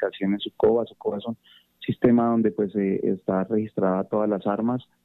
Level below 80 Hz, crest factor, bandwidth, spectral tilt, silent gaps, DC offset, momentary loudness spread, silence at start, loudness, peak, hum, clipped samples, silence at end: -60 dBFS; 18 dB; 4.1 kHz; -10 dB/octave; none; under 0.1%; 11 LU; 0 s; -24 LUFS; -6 dBFS; none; under 0.1%; 0.2 s